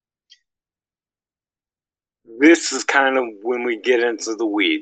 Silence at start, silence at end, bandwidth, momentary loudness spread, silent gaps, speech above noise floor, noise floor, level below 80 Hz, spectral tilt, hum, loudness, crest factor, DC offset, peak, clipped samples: 2.3 s; 0 s; 9.2 kHz; 9 LU; none; over 72 dB; under -90 dBFS; -78 dBFS; -1.5 dB/octave; none; -18 LUFS; 20 dB; under 0.1%; 0 dBFS; under 0.1%